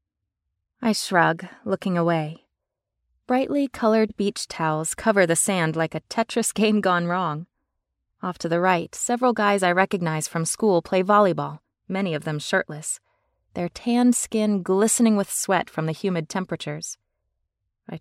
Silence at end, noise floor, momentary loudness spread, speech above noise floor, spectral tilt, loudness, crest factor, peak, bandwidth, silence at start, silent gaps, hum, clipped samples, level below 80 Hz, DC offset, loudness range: 0 s; -83 dBFS; 12 LU; 60 dB; -4.5 dB/octave; -23 LUFS; 20 dB; -4 dBFS; 16 kHz; 0.8 s; none; none; under 0.1%; -62 dBFS; under 0.1%; 3 LU